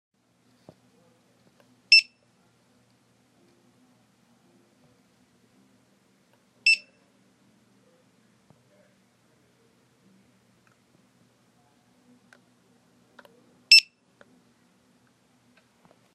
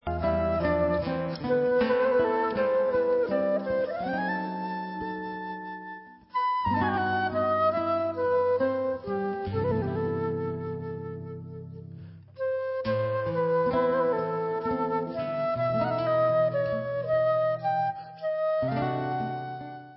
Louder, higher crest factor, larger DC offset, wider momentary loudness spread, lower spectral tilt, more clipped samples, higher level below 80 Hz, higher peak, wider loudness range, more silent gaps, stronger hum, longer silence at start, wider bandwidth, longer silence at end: first, -18 LUFS vs -28 LUFS; first, 30 dB vs 14 dB; neither; first, 20 LU vs 12 LU; second, 2.5 dB/octave vs -11 dB/octave; neither; second, -86 dBFS vs -50 dBFS; first, -2 dBFS vs -14 dBFS; about the same, 6 LU vs 6 LU; neither; neither; first, 1.9 s vs 0.05 s; first, 14 kHz vs 5.8 kHz; first, 2.35 s vs 0 s